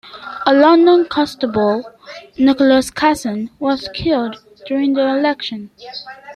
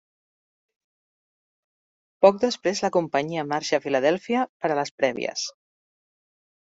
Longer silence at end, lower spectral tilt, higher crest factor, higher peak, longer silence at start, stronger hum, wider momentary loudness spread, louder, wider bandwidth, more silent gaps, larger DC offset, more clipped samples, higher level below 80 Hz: second, 0 s vs 1.1 s; about the same, -5 dB/octave vs -4 dB/octave; second, 14 dB vs 24 dB; about the same, -2 dBFS vs -2 dBFS; second, 0.05 s vs 2.2 s; neither; first, 20 LU vs 8 LU; first, -15 LUFS vs -24 LUFS; first, 13.5 kHz vs 8 kHz; second, none vs 4.49-4.60 s, 4.91-4.98 s; neither; neither; first, -50 dBFS vs -70 dBFS